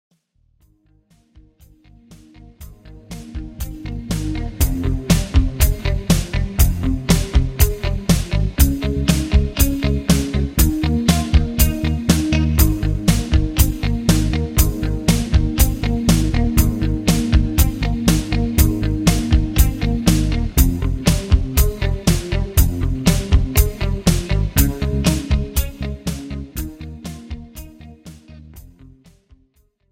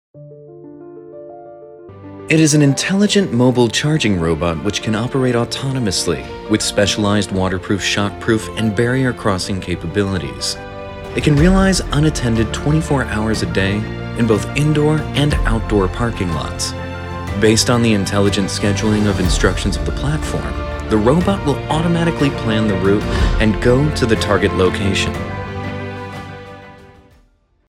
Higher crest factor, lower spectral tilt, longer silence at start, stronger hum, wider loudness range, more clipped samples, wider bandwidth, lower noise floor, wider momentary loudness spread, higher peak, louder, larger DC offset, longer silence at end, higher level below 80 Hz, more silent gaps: about the same, 18 dB vs 16 dB; about the same, -5.5 dB/octave vs -5 dB/octave; first, 2.1 s vs 0.15 s; neither; first, 10 LU vs 3 LU; neither; first, 17.5 kHz vs 15.5 kHz; first, -60 dBFS vs -55 dBFS; about the same, 11 LU vs 12 LU; about the same, 0 dBFS vs 0 dBFS; about the same, -18 LUFS vs -16 LUFS; neither; first, 1.25 s vs 0.85 s; first, -20 dBFS vs -28 dBFS; neither